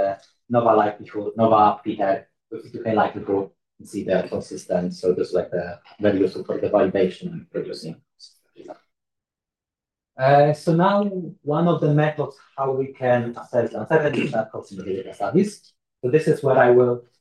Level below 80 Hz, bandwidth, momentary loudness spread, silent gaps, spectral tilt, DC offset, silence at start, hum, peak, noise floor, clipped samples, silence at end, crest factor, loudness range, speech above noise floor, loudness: -68 dBFS; 12 kHz; 14 LU; none; -7.5 dB/octave; under 0.1%; 0 s; none; -4 dBFS; -89 dBFS; under 0.1%; 0.2 s; 18 dB; 5 LU; 68 dB; -21 LUFS